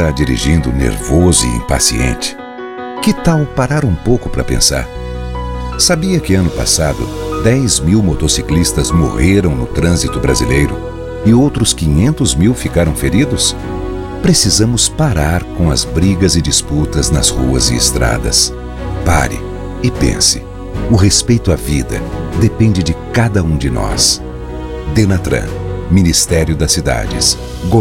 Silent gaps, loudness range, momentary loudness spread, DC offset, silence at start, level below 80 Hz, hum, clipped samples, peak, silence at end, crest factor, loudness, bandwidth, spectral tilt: none; 2 LU; 11 LU; under 0.1%; 0 s; -22 dBFS; none; under 0.1%; 0 dBFS; 0 s; 12 dB; -13 LUFS; 16.5 kHz; -4.5 dB/octave